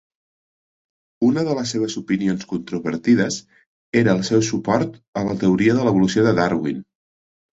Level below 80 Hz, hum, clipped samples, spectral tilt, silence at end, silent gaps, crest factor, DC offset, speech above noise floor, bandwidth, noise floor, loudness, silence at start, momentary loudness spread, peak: -54 dBFS; none; under 0.1%; -6 dB/octave; 0.75 s; 3.66-3.93 s, 5.08-5.13 s; 18 dB; under 0.1%; over 71 dB; 8 kHz; under -90 dBFS; -20 LUFS; 1.2 s; 9 LU; -4 dBFS